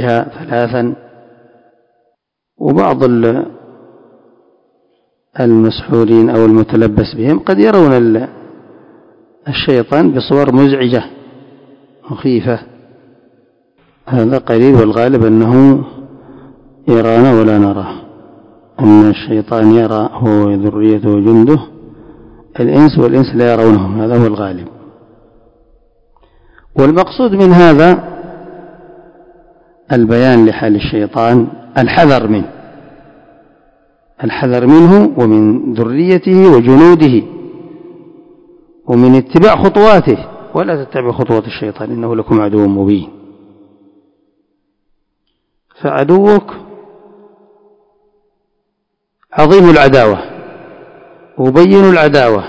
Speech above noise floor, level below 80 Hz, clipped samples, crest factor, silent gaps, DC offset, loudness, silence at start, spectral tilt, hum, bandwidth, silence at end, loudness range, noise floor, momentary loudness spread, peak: 61 dB; -40 dBFS; 3%; 10 dB; none; under 0.1%; -9 LUFS; 0 s; -8.5 dB/octave; none; 8 kHz; 0 s; 7 LU; -69 dBFS; 15 LU; 0 dBFS